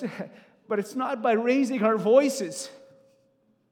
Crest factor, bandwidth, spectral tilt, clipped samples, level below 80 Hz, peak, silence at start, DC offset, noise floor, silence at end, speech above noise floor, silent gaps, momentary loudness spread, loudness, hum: 20 dB; 17.5 kHz; -5 dB/octave; under 0.1%; under -90 dBFS; -6 dBFS; 0 s; under 0.1%; -67 dBFS; 0.95 s; 42 dB; none; 18 LU; -25 LUFS; none